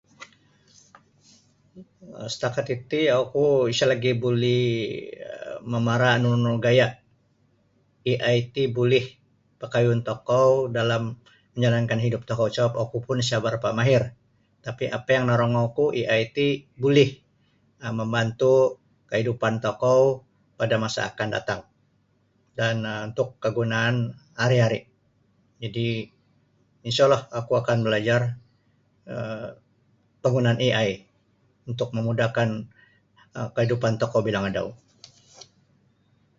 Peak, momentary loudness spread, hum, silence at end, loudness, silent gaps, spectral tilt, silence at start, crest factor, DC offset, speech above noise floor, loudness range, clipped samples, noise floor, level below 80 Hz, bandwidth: -6 dBFS; 15 LU; none; 1.65 s; -24 LUFS; none; -6 dB/octave; 0.2 s; 20 dB; under 0.1%; 43 dB; 4 LU; under 0.1%; -66 dBFS; -60 dBFS; 7.8 kHz